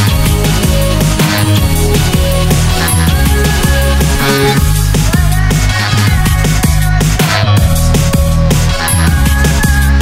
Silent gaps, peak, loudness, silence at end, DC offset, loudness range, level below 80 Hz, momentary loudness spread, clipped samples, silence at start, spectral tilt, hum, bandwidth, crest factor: none; 0 dBFS; -10 LUFS; 0 s; under 0.1%; 0 LU; -14 dBFS; 1 LU; under 0.1%; 0 s; -4.5 dB/octave; none; 16.5 kHz; 10 dB